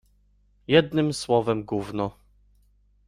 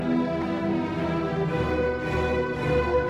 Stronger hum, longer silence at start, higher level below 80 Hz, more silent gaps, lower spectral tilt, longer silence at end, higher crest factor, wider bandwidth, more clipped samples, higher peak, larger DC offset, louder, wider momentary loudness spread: first, 50 Hz at -50 dBFS vs none; first, 0.7 s vs 0 s; second, -56 dBFS vs -40 dBFS; neither; second, -5.5 dB/octave vs -7.5 dB/octave; first, 0.95 s vs 0 s; first, 22 dB vs 12 dB; first, 12.5 kHz vs 11 kHz; neither; first, -4 dBFS vs -12 dBFS; neither; about the same, -24 LUFS vs -26 LUFS; first, 11 LU vs 2 LU